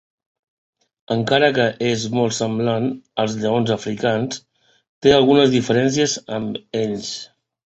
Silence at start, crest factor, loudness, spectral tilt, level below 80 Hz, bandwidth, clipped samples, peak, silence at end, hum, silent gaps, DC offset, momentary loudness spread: 1.1 s; 18 dB; -19 LUFS; -5 dB/octave; -54 dBFS; 8.2 kHz; under 0.1%; 0 dBFS; 0.4 s; none; 4.89-5.01 s; under 0.1%; 12 LU